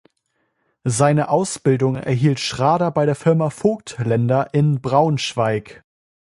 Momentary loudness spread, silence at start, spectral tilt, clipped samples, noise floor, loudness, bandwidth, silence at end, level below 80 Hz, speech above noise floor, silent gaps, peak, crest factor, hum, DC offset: 5 LU; 0.85 s; -6 dB/octave; under 0.1%; -70 dBFS; -19 LUFS; 11.5 kHz; 0.65 s; -54 dBFS; 52 dB; none; -2 dBFS; 18 dB; none; under 0.1%